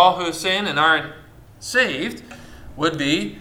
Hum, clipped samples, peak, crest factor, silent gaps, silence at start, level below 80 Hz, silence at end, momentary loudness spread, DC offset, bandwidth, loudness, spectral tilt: none; under 0.1%; 0 dBFS; 20 dB; none; 0 s; -48 dBFS; 0 s; 21 LU; under 0.1%; 17.5 kHz; -20 LUFS; -3.5 dB/octave